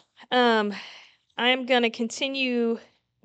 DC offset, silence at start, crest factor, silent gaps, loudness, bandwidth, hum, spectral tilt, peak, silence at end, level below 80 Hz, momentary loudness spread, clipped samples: under 0.1%; 0.2 s; 18 dB; none; -24 LUFS; 9 kHz; none; -3 dB/octave; -8 dBFS; 0.45 s; -82 dBFS; 15 LU; under 0.1%